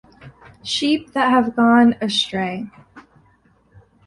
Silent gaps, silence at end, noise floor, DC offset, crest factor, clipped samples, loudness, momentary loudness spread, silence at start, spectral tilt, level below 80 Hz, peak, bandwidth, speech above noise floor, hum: none; 1.05 s; -57 dBFS; under 0.1%; 18 dB; under 0.1%; -17 LUFS; 16 LU; 0.25 s; -4.5 dB/octave; -56 dBFS; -2 dBFS; 11 kHz; 39 dB; none